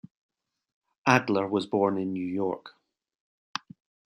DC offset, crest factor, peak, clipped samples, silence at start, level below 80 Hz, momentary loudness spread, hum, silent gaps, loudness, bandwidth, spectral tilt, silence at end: under 0.1%; 26 dB; -4 dBFS; under 0.1%; 1.05 s; -74 dBFS; 15 LU; none; 3.15-3.54 s; -27 LUFS; 14.5 kHz; -6 dB/octave; 0.6 s